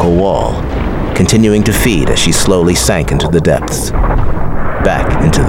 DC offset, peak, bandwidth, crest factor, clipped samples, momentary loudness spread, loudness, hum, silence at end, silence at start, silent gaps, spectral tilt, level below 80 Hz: under 0.1%; 0 dBFS; 17 kHz; 10 dB; under 0.1%; 7 LU; -12 LUFS; none; 0 s; 0 s; none; -5 dB/octave; -18 dBFS